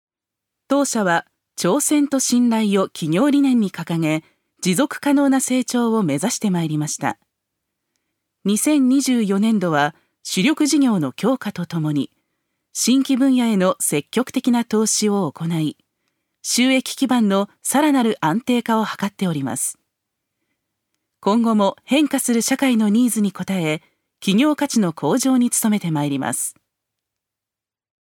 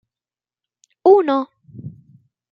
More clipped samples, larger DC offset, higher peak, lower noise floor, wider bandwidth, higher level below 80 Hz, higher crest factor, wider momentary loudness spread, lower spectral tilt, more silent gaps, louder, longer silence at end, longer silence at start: neither; neither; about the same, -4 dBFS vs -2 dBFS; about the same, -88 dBFS vs under -90 dBFS; first, 17.5 kHz vs 5.4 kHz; about the same, -70 dBFS vs -68 dBFS; about the same, 16 dB vs 18 dB; second, 8 LU vs 24 LU; second, -4.5 dB/octave vs -8 dB/octave; neither; second, -19 LUFS vs -16 LUFS; first, 1.65 s vs 0.6 s; second, 0.7 s vs 1.05 s